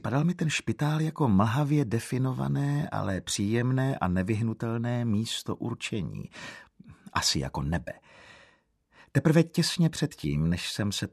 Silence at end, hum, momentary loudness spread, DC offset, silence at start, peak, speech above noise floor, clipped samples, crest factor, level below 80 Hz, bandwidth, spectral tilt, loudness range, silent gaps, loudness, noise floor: 0.05 s; none; 10 LU; under 0.1%; 0.05 s; -8 dBFS; 37 dB; under 0.1%; 20 dB; -52 dBFS; 14 kHz; -5.5 dB/octave; 5 LU; none; -28 LUFS; -65 dBFS